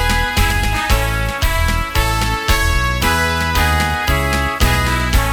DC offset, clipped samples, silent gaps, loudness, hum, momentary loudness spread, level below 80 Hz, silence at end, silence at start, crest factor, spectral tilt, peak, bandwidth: under 0.1%; under 0.1%; none; -16 LUFS; none; 2 LU; -20 dBFS; 0 s; 0 s; 14 dB; -4 dB/octave; 0 dBFS; 18 kHz